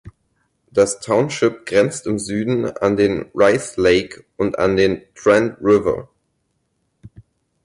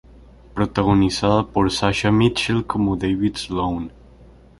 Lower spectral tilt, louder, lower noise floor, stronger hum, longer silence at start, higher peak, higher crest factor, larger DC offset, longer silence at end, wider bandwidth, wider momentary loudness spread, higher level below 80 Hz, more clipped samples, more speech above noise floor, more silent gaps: about the same, -5 dB/octave vs -6 dB/octave; about the same, -18 LUFS vs -20 LUFS; first, -69 dBFS vs -47 dBFS; neither; second, 0.05 s vs 0.55 s; about the same, -4 dBFS vs -2 dBFS; about the same, 16 dB vs 18 dB; neither; first, 1.6 s vs 0.7 s; about the same, 11.5 kHz vs 11.5 kHz; about the same, 7 LU vs 8 LU; second, -48 dBFS vs -40 dBFS; neither; first, 52 dB vs 28 dB; neither